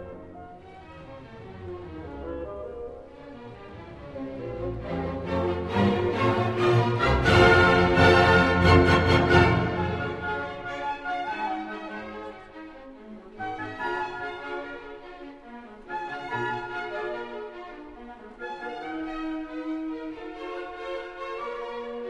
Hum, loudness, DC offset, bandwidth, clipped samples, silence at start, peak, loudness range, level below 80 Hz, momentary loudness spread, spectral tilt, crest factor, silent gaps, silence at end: none; -25 LUFS; under 0.1%; 12 kHz; under 0.1%; 0 s; -4 dBFS; 18 LU; -42 dBFS; 25 LU; -6.5 dB/octave; 22 dB; none; 0 s